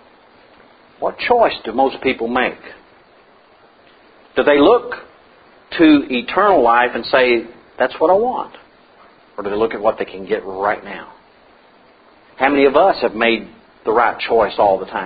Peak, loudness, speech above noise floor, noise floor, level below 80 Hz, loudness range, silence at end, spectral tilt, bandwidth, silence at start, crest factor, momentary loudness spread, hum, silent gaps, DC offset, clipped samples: 0 dBFS; -16 LUFS; 34 dB; -49 dBFS; -50 dBFS; 7 LU; 0 s; -10 dB/octave; 5 kHz; 1 s; 18 dB; 14 LU; none; none; under 0.1%; under 0.1%